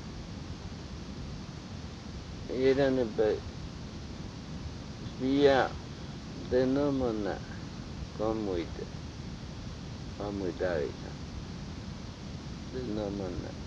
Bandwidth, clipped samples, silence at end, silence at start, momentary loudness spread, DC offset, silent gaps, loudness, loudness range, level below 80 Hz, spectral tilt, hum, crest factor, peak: 8.6 kHz; under 0.1%; 0 s; 0 s; 15 LU; under 0.1%; none; -34 LUFS; 7 LU; -48 dBFS; -6.5 dB/octave; none; 22 dB; -12 dBFS